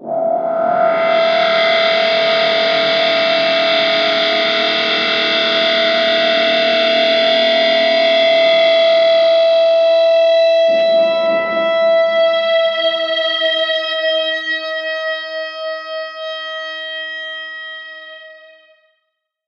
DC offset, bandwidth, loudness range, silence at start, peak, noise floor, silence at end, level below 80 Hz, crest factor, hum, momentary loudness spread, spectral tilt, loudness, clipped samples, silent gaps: under 0.1%; 6.8 kHz; 11 LU; 0 s; -2 dBFS; -72 dBFS; 1.1 s; -80 dBFS; 12 dB; none; 12 LU; -3 dB/octave; -13 LUFS; under 0.1%; none